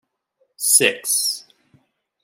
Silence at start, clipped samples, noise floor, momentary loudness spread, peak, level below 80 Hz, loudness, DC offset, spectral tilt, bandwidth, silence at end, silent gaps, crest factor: 0.6 s; under 0.1%; -68 dBFS; 10 LU; -2 dBFS; -82 dBFS; -16 LUFS; under 0.1%; 0 dB/octave; 16.5 kHz; 0.85 s; none; 22 dB